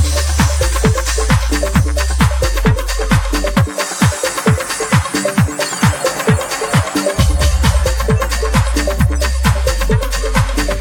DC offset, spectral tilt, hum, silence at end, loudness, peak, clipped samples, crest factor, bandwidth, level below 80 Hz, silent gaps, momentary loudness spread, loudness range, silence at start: under 0.1%; -4.5 dB/octave; none; 0 s; -15 LUFS; 0 dBFS; under 0.1%; 14 dB; 18.5 kHz; -18 dBFS; none; 2 LU; 1 LU; 0 s